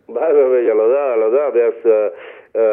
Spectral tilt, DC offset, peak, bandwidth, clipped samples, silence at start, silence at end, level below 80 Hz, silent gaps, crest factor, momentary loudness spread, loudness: -9 dB/octave; under 0.1%; -2 dBFS; 3.4 kHz; under 0.1%; 0.1 s; 0 s; -74 dBFS; none; 12 dB; 5 LU; -15 LUFS